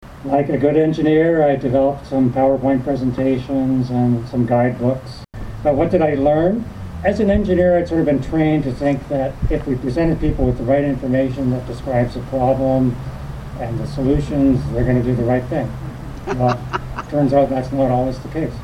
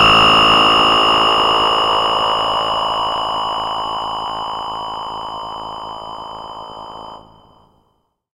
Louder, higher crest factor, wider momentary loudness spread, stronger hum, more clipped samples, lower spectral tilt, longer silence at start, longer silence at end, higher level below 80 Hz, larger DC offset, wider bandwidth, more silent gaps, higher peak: second, -18 LUFS vs -14 LUFS; about the same, 14 dB vs 16 dB; second, 9 LU vs 21 LU; neither; neither; first, -9 dB/octave vs -3 dB/octave; about the same, 0 s vs 0 s; second, 0 s vs 1.15 s; first, -32 dBFS vs -42 dBFS; neither; second, 11 kHz vs 16 kHz; neither; about the same, -2 dBFS vs 0 dBFS